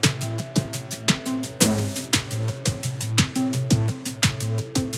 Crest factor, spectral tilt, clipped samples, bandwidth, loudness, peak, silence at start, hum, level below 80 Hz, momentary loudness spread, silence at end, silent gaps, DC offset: 22 dB; -4 dB/octave; under 0.1%; 16.5 kHz; -24 LUFS; -2 dBFS; 0 s; none; -48 dBFS; 7 LU; 0 s; none; under 0.1%